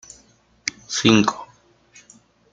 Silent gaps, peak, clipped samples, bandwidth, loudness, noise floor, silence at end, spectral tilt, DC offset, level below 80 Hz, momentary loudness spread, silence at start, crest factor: none; -2 dBFS; under 0.1%; 9.2 kHz; -20 LUFS; -56 dBFS; 1.1 s; -4 dB/octave; under 0.1%; -58 dBFS; 14 LU; 0.65 s; 22 dB